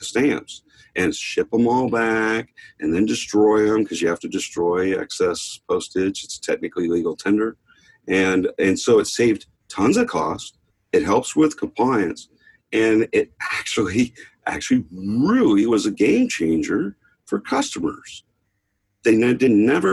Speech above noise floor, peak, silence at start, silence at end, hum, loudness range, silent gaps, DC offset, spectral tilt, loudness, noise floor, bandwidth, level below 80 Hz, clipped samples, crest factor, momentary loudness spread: 53 dB; -4 dBFS; 0 s; 0 s; none; 3 LU; none; under 0.1%; -5 dB/octave; -20 LUFS; -72 dBFS; 12.5 kHz; -54 dBFS; under 0.1%; 16 dB; 11 LU